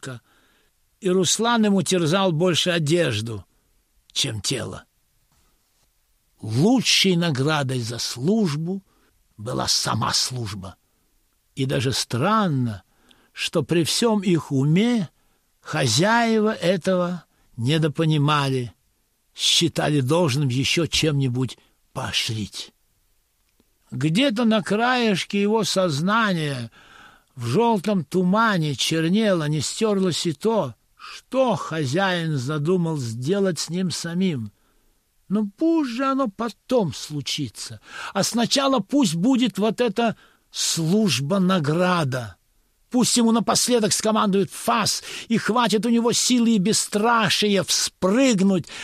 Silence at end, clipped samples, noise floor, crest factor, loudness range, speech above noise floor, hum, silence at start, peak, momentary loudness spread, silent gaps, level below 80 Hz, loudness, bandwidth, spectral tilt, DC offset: 0 s; under 0.1%; -67 dBFS; 18 dB; 5 LU; 46 dB; none; 0.05 s; -4 dBFS; 12 LU; none; -58 dBFS; -21 LUFS; 15 kHz; -4.5 dB/octave; under 0.1%